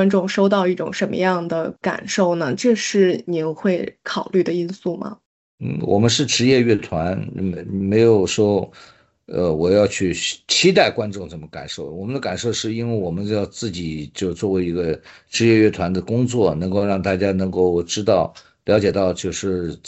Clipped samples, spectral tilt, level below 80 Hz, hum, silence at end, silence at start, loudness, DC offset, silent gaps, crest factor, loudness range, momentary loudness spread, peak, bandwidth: under 0.1%; -5 dB/octave; -52 dBFS; none; 0 s; 0 s; -19 LUFS; under 0.1%; 5.26-5.58 s; 18 dB; 5 LU; 12 LU; -2 dBFS; 8.2 kHz